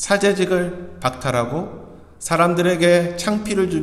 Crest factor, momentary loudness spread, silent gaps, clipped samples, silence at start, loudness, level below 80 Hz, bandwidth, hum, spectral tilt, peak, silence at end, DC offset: 16 dB; 12 LU; none; under 0.1%; 0 s; -19 LUFS; -48 dBFS; 14 kHz; none; -5 dB/octave; -2 dBFS; 0 s; under 0.1%